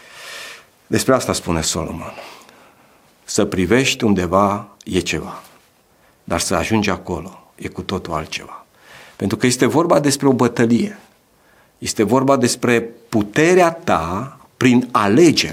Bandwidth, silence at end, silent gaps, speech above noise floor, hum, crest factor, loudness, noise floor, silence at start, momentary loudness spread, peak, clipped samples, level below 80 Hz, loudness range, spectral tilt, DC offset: 16.5 kHz; 0 s; none; 38 dB; none; 18 dB; -17 LUFS; -55 dBFS; 0.15 s; 17 LU; 0 dBFS; under 0.1%; -46 dBFS; 7 LU; -4.5 dB/octave; under 0.1%